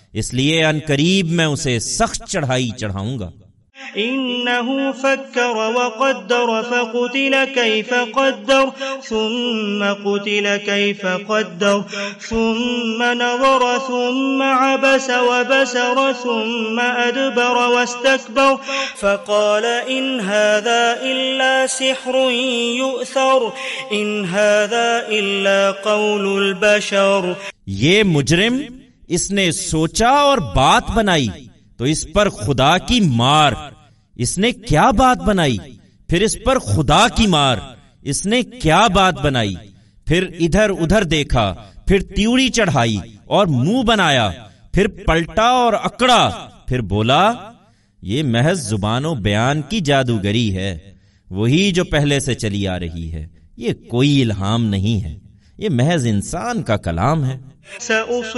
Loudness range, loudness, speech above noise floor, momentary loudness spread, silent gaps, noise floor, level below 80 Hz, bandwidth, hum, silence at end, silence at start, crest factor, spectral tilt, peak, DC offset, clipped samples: 4 LU; -17 LUFS; 34 dB; 9 LU; none; -51 dBFS; -36 dBFS; 11.5 kHz; none; 0 s; 0.15 s; 16 dB; -4.5 dB/octave; -2 dBFS; under 0.1%; under 0.1%